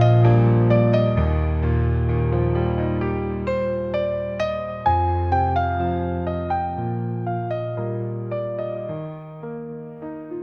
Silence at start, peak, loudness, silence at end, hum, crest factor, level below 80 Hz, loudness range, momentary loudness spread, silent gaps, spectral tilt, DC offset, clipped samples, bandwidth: 0 s; -4 dBFS; -22 LUFS; 0 s; none; 18 dB; -36 dBFS; 7 LU; 16 LU; none; -10 dB/octave; 0.1%; under 0.1%; 5.4 kHz